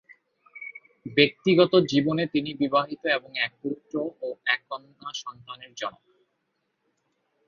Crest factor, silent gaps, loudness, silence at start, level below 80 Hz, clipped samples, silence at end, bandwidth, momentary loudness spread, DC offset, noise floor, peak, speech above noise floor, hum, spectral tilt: 24 dB; none; -25 LUFS; 0.55 s; -68 dBFS; under 0.1%; 1.55 s; 7.2 kHz; 20 LU; under 0.1%; -76 dBFS; -4 dBFS; 51 dB; none; -5.5 dB/octave